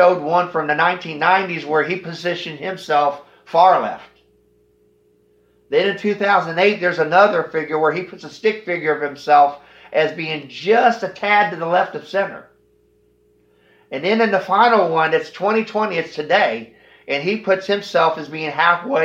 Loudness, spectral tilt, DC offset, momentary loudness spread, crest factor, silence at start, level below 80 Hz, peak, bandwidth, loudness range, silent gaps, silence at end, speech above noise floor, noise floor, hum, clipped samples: -18 LUFS; -5.5 dB/octave; under 0.1%; 11 LU; 18 dB; 0 s; -70 dBFS; 0 dBFS; 8 kHz; 3 LU; none; 0 s; 40 dB; -58 dBFS; none; under 0.1%